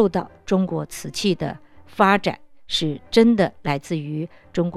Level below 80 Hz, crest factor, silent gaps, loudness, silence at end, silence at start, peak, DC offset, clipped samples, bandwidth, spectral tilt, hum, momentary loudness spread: -52 dBFS; 20 dB; none; -22 LUFS; 0 s; 0 s; -2 dBFS; under 0.1%; under 0.1%; 13.5 kHz; -5.5 dB/octave; none; 13 LU